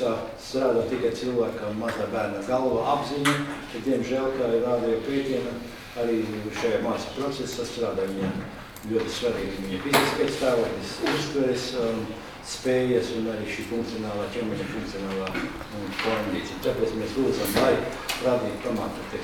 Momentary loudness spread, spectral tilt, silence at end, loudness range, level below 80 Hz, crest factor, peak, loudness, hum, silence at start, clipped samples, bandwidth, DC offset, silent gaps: 8 LU; -5 dB/octave; 0 s; 3 LU; -50 dBFS; 22 dB; -4 dBFS; -27 LUFS; none; 0 s; under 0.1%; 19.5 kHz; under 0.1%; none